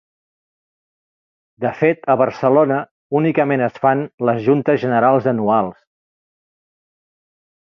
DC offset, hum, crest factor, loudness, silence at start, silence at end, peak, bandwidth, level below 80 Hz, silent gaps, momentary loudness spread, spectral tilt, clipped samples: under 0.1%; none; 18 dB; -17 LUFS; 1.6 s; 1.95 s; -2 dBFS; 6.2 kHz; -64 dBFS; 2.91-3.10 s, 4.14-4.18 s; 7 LU; -9 dB/octave; under 0.1%